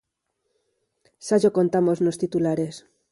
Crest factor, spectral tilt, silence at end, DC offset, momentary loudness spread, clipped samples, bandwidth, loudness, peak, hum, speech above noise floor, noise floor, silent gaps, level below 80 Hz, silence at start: 18 dB; -7 dB/octave; 0.3 s; under 0.1%; 9 LU; under 0.1%; 11.5 kHz; -22 LUFS; -8 dBFS; none; 55 dB; -77 dBFS; none; -66 dBFS; 1.25 s